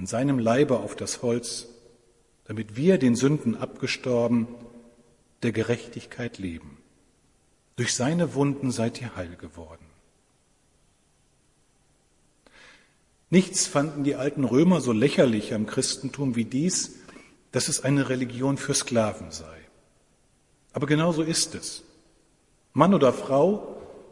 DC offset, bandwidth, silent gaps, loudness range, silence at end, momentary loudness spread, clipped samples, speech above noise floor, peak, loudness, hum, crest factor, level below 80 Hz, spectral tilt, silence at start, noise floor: under 0.1%; 11.5 kHz; none; 8 LU; 0.1 s; 17 LU; under 0.1%; 41 dB; -4 dBFS; -25 LUFS; none; 24 dB; -60 dBFS; -5 dB/octave; 0 s; -65 dBFS